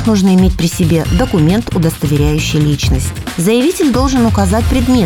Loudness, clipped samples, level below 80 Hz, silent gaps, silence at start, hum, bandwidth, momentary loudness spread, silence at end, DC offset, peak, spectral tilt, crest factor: -12 LUFS; under 0.1%; -22 dBFS; none; 0 s; none; 17.5 kHz; 4 LU; 0 s; under 0.1%; 0 dBFS; -6 dB/octave; 12 dB